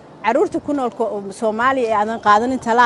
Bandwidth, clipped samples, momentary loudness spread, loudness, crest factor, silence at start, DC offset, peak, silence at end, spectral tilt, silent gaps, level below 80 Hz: 11.5 kHz; under 0.1%; 8 LU; -18 LUFS; 16 dB; 0.15 s; under 0.1%; -2 dBFS; 0 s; -4.5 dB/octave; none; -54 dBFS